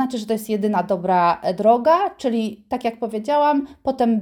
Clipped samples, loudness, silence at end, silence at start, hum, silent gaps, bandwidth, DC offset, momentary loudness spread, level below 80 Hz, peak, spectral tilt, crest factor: under 0.1%; -20 LUFS; 0 s; 0 s; none; none; 17 kHz; under 0.1%; 9 LU; -58 dBFS; -4 dBFS; -6.5 dB/octave; 16 dB